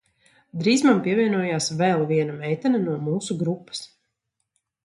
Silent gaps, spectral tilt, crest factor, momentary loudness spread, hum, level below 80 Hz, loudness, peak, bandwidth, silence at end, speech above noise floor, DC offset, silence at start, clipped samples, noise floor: none; -5.5 dB/octave; 20 dB; 11 LU; none; -68 dBFS; -22 LUFS; -4 dBFS; 11.5 kHz; 1 s; 56 dB; under 0.1%; 0.55 s; under 0.1%; -78 dBFS